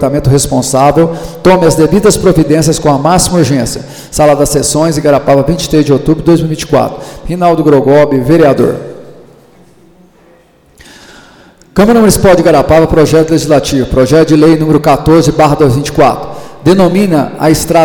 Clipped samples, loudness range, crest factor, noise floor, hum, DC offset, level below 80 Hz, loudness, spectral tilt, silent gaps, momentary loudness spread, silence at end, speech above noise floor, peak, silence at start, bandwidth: 0.3%; 5 LU; 8 dB; -43 dBFS; none; under 0.1%; -28 dBFS; -8 LUFS; -5.5 dB/octave; none; 6 LU; 0 s; 36 dB; 0 dBFS; 0 s; 19.5 kHz